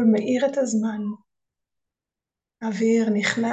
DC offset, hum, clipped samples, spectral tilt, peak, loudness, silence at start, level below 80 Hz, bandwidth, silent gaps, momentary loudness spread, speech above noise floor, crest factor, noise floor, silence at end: under 0.1%; none; under 0.1%; -5 dB/octave; -6 dBFS; -23 LUFS; 0 s; -74 dBFS; 8.4 kHz; none; 13 LU; 67 dB; 18 dB; -89 dBFS; 0 s